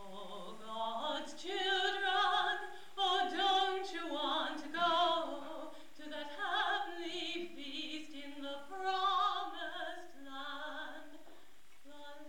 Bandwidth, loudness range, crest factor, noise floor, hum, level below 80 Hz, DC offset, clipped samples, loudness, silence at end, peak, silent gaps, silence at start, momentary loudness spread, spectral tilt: 18 kHz; 6 LU; 16 dB; -65 dBFS; none; -78 dBFS; 0.4%; under 0.1%; -36 LUFS; 0 s; -22 dBFS; none; 0 s; 17 LU; -2 dB/octave